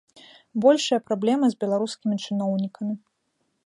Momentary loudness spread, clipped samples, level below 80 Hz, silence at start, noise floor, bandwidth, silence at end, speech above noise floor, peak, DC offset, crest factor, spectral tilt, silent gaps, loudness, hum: 12 LU; under 0.1%; -76 dBFS; 0.55 s; -73 dBFS; 11 kHz; 0.7 s; 51 dB; -6 dBFS; under 0.1%; 20 dB; -5.5 dB/octave; none; -24 LUFS; none